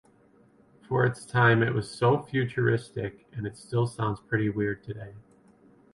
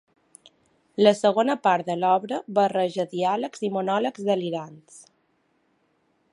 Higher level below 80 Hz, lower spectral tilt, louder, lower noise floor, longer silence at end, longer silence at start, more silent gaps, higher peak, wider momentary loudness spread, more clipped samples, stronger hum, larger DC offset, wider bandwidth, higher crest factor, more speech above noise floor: first, -58 dBFS vs -78 dBFS; first, -7 dB/octave vs -5.5 dB/octave; second, -27 LUFS vs -23 LUFS; second, -60 dBFS vs -68 dBFS; second, 0.75 s vs 1.3 s; about the same, 0.9 s vs 1 s; neither; second, -8 dBFS vs -4 dBFS; first, 15 LU vs 8 LU; neither; neither; neither; about the same, 11.5 kHz vs 11.5 kHz; about the same, 20 dB vs 22 dB; second, 33 dB vs 45 dB